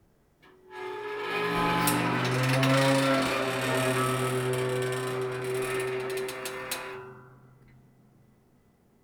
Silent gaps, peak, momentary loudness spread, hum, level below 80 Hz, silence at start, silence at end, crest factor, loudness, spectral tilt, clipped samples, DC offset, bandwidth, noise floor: none; -10 dBFS; 13 LU; none; -58 dBFS; 0.7 s; 1.7 s; 18 dB; -28 LUFS; -4.5 dB/octave; under 0.1%; under 0.1%; over 20 kHz; -63 dBFS